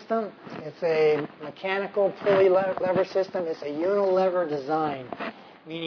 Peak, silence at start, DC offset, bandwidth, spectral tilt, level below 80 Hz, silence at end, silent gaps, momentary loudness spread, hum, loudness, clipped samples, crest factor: -10 dBFS; 0 s; under 0.1%; 5.4 kHz; -7 dB/octave; -70 dBFS; 0 s; none; 15 LU; none; -25 LUFS; under 0.1%; 16 dB